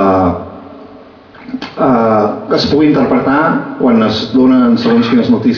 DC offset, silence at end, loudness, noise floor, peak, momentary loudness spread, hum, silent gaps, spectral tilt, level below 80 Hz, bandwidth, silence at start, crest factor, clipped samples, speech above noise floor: under 0.1%; 0 s; -11 LUFS; -36 dBFS; 0 dBFS; 14 LU; none; none; -7 dB/octave; -44 dBFS; 5.4 kHz; 0 s; 10 dB; under 0.1%; 27 dB